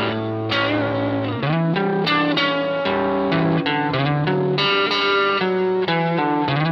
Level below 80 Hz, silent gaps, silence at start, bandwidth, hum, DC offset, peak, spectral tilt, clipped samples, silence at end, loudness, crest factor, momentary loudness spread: -54 dBFS; none; 0 s; 6.8 kHz; none; under 0.1%; -6 dBFS; -7.5 dB/octave; under 0.1%; 0 s; -19 LUFS; 14 dB; 4 LU